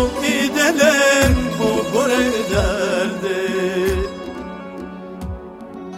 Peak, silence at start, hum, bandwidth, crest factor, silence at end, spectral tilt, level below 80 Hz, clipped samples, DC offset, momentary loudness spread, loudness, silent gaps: -2 dBFS; 0 s; none; 16.5 kHz; 16 dB; 0 s; -4 dB/octave; -30 dBFS; under 0.1%; under 0.1%; 18 LU; -17 LUFS; none